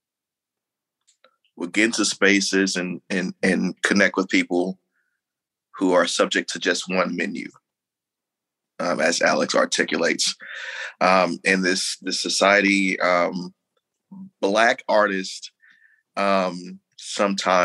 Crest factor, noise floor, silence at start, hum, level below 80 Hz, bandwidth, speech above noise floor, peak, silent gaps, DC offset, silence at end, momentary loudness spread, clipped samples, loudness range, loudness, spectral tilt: 20 dB; -88 dBFS; 1.55 s; none; -72 dBFS; 12.5 kHz; 66 dB; -2 dBFS; none; under 0.1%; 0 s; 14 LU; under 0.1%; 4 LU; -21 LUFS; -3.5 dB/octave